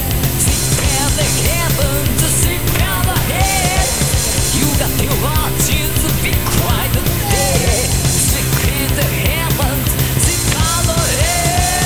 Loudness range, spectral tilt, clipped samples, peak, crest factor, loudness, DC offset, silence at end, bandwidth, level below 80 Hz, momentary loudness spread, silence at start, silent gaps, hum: 1 LU; -3.5 dB/octave; under 0.1%; 0 dBFS; 14 dB; -14 LUFS; 3%; 0 s; 20 kHz; -22 dBFS; 2 LU; 0 s; none; none